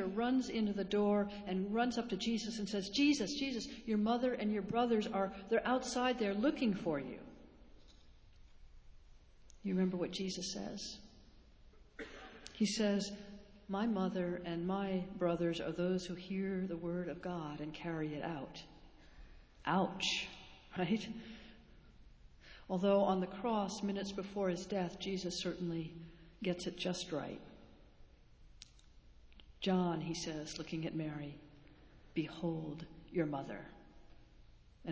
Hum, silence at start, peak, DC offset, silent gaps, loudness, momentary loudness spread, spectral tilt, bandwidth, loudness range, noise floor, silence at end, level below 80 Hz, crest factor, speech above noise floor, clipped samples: none; 0 s; -20 dBFS; under 0.1%; none; -38 LUFS; 17 LU; -5.5 dB/octave; 8 kHz; 8 LU; -61 dBFS; 0 s; -64 dBFS; 20 dB; 24 dB; under 0.1%